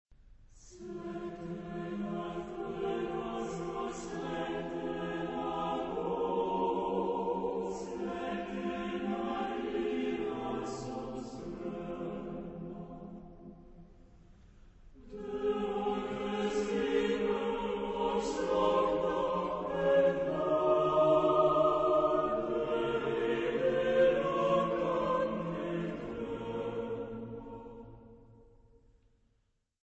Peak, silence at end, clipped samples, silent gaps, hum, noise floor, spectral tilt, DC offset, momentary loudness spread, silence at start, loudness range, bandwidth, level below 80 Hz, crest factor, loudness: -16 dBFS; 1.4 s; under 0.1%; none; none; -76 dBFS; -6 dB/octave; under 0.1%; 15 LU; 0.25 s; 13 LU; 8.4 kHz; -58 dBFS; 18 dB; -33 LUFS